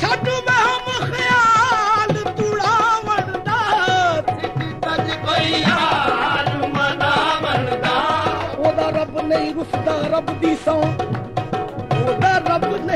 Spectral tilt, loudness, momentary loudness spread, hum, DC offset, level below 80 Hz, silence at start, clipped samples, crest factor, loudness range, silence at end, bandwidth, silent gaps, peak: -5 dB/octave; -18 LUFS; 7 LU; none; under 0.1%; -46 dBFS; 0 s; under 0.1%; 14 dB; 4 LU; 0 s; 15 kHz; none; -4 dBFS